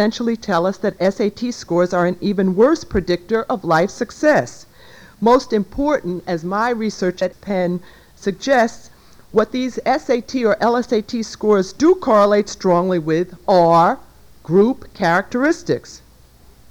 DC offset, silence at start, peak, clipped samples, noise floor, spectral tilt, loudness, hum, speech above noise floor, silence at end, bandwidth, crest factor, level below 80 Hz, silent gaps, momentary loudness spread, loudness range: under 0.1%; 0 s; -4 dBFS; under 0.1%; -48 dBFS; -6 dB/octave; -18 LUFS; none; 31 dB; 0.75 s; 20 kHz; 14 dB; -46 dBFS; none; 8 LU; 5 LU